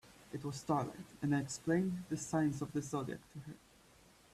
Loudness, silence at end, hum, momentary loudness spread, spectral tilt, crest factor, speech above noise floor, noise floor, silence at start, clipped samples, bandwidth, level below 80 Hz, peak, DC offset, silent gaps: -38 LUFS; 0.75 s; none; 15 LU; -6 dB/octave; 18 dB; 26 dB; -64 dBFS; 0.05 s; under 0.1%; 14 kHz; -68 dBFS; -22 dBFS; under 0.1%; none